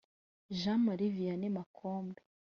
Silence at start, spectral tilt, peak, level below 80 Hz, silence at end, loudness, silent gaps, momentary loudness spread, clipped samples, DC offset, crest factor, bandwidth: 0.5 s; -6.5 dB/octave; -22 dBFS; -74 dBFS; 0.4 s; -36 LUFS; 1.66-1.74 s; 12 LU; under 0.1%; under 0.1%; 14 dB; 6.8 kHz